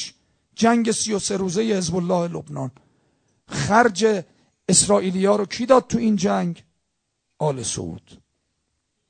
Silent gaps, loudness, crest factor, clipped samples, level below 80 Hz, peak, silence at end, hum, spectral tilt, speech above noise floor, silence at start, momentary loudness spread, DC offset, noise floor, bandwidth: none; -20 LUFS; 22 dB; under 0.1%; -54 dBFS; 0 dBFS; 0.95 s; none; -4 dB/octave; 55 dB; 0 s; 15 LU; under 0.1%; -75 dBFS; 9.4 kHz